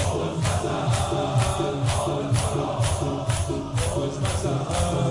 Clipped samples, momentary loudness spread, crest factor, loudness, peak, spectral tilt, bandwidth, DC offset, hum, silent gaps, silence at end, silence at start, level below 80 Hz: under 0.1%; 3 LU; 14 dB; -25 LUFS; -10 dBFS; -5.5 dB/octave; 11.5 kHz; under 0.1%; none; none; 0 s; 0 s; -40 dBFS